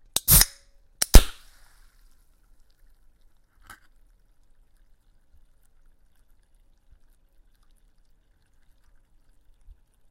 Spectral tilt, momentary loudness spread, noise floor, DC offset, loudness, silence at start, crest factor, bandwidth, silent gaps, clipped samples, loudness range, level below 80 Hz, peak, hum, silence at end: -2.5 dB/octave; 12 LU; -60 dBFS; under 0.1%; -19 LUFS; 0.3 s; 26 dB; 16 kHz; none; under 0.1%; 5 LU; -28 dBFS; 0 dBFS; none; 8.8 s